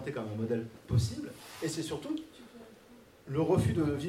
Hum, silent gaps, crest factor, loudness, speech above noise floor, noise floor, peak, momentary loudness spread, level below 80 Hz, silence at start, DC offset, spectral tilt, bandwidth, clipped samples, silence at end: none; none; 18 dB; -33 LUFS; 25 dB; -57 dBFS; -16 dBFS; 24 LU; -54 dBFS; 0 s; under 0.1%; -6.5 dB/octave; 16 kHz; under 0.1%; 0 s